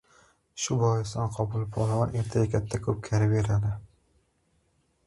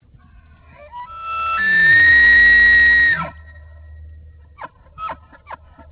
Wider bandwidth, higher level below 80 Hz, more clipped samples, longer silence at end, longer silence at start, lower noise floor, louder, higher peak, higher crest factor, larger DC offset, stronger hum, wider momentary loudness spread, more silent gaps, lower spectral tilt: first, 11.5 kHz vs 4 kHz; second, -48 dBFS vs -38 dBFS; neither; first, 1.2 s vs 0.35 s; second, 0.55 s vs 0.95 s; first, -70 dBFS vs -47 dBFS; second, -28 LUFS vs -10 LUFS; second, -12 dBFS vs -6 dBFS; first, 18 dB vs 12 dB; neither; neither; second, 7 LU vs 23 LU; neither; first, -6.5 dB/octave vs -5 dB/octave